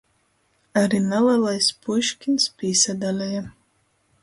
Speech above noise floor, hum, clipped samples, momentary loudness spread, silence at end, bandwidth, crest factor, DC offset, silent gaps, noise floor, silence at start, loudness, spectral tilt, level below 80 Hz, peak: 45 dB; none; under 0.1%; 8 LU; 0.75 s; 11.5 kHz; 18 dB; under 0.1%; none; -66 dBFS; 0.75 s; -21 LUFS; -3.5 dB/octave; -62 dBFS; -6 dBFS